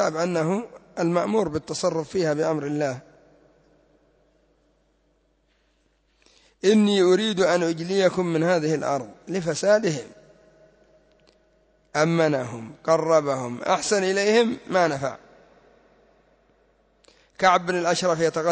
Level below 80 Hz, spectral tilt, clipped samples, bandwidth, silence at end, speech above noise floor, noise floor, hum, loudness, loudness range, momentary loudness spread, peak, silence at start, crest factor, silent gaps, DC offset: -62 dBFS; -5 dB/octave; under 0.1%; 8 kHz; 0 s; 44 dB; -66 dBFS; none; -23 LUFS; 7 LU; 10 LU; -6 dBFS; 0 s; 20 dB; none; under 0.1%